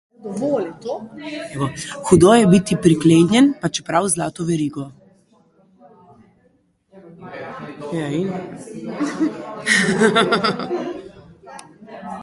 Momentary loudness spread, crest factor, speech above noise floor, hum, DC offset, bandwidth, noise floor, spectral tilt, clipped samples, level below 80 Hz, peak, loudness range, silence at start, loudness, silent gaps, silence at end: 21 LU; 20 dB; 43 dB; none; under 0.1%; 11.5 kHz; -60 dBFS; -5 dB/octave; under 0.1%; -50 dBFS; 0 dBFS; 15 LU; 0.25 s; -18 LUFS; none; 0 s